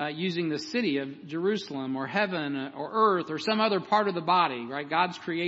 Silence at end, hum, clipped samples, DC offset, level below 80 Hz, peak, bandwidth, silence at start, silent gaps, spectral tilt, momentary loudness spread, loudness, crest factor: 0 s; none; under 0.1%; under 0.1%; -78 dBFS; -10 dBFS; 8 kHz; 0 s; none; -5.5 dB/octave; 8 LU; -28 LUFS; 18 dB